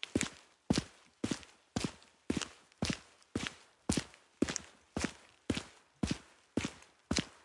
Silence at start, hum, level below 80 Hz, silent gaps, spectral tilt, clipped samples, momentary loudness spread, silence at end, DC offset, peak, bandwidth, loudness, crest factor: 0.05 s; none; -56 dBFS; none; -4 dB/octave; under 0.1%; 10 LU; 0.15 s; under 0.1%; -12 dBFS; 11.5 kHz; -39 LUFS; 28 dB